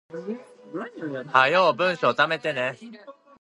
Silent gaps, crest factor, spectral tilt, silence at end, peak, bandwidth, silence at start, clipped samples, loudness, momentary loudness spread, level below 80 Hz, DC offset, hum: none; 22 dB; -5 dB/octave; 0.3 s; -2 dBFS; 11.5 kHz; 0.1 s; under 0.1%; -22 LUFS; 19 LU; -78 dBFS; under 0.1%; none